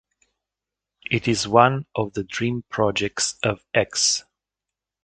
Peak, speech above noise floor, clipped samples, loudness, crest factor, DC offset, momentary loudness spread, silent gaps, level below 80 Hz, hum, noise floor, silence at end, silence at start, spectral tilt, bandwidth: 0 dBFS; 65 dB; under 0.1%; -22 LUFS; 24 dB; under 0.1%; 10 LU; none; -54 dBFS; none; -87 dBFS; 0.85 s; 1.1 s; -3.5 dB/octave; 9.4 kHz